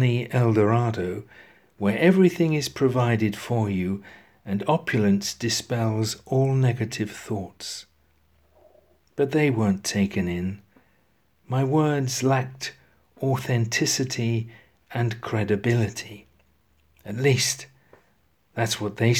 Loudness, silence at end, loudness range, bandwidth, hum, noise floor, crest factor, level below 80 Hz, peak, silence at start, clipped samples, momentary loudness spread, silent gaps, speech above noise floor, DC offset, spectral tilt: -24 LUFS; 0 s; 5 LU; 16 kHz; none; -66 dBFS; 20 dB; -60 dBFS; -6 dBFS; 0 s; under 0.1%; 14 LU; none; 43 dB; under 0.1%; -5.5 dB/octave